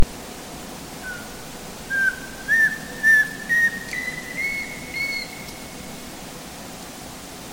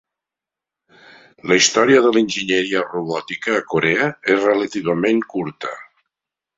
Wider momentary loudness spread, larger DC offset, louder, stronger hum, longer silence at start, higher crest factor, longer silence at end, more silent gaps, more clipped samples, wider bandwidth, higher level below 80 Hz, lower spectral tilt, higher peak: first, 18 LU vs 13 LU; neither; second, -21 LUFS vs -17 LUFS; neither; second, 0 s vs 1.45 s; about the same, 20 dB vs 18 dB; second, 0 s vs 0.75 s; neither; neither; first, 17 kHz vs 7.8 kHz; first, -42 dBFS vs -60 dBFS; about the same, -2.5 dB/octave vs -3.5 dB/octave; second, -4 dBFS vs 0 dBFS